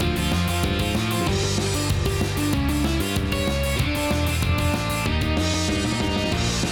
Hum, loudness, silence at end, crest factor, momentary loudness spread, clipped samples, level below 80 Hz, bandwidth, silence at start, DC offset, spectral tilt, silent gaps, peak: none; -23 LUFS; 0 s; 14 dB; 1 LU; under 0.1%; -30 dBFS; 19.5 kHz; 0 s; under 0.1%; -4.5 dB/octave; none; -8 dBFS